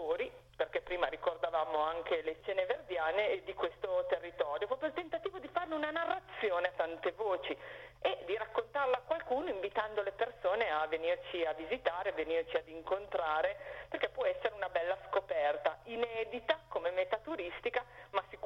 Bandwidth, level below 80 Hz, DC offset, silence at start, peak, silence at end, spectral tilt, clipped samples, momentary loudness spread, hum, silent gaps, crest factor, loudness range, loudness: 7.2 kHz; -66 dBFS; under 0.1%; 0 s; -16 dBFS; 0 s; -5 dB/octave; under 0.1%; 5 LU; none; none; 20 dB; 1 LU; -36 LUFS